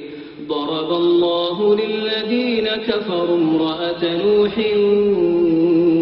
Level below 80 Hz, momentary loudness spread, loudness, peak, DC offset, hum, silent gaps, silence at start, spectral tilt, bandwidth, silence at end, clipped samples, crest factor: -54 dBFS; 6 LU; -18 LUFS; -4 dBFS; under 0.1%; none; none; 0 s; -9 dB/octave; 5.6 kHz; 0 s; under 0.1%; 12 dB